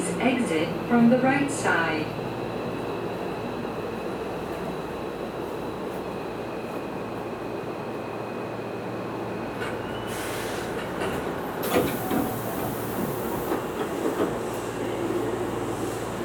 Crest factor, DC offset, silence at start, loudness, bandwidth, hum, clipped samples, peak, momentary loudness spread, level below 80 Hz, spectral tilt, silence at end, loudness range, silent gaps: 20 dB; under 0.1%; 0 s; -28 LUFS; over 20 kHz; none; under 0.1%; -8 dBFS; 9 LU; -52 dBFS; -5.5 dB/octave; 0 s; 8 LU; none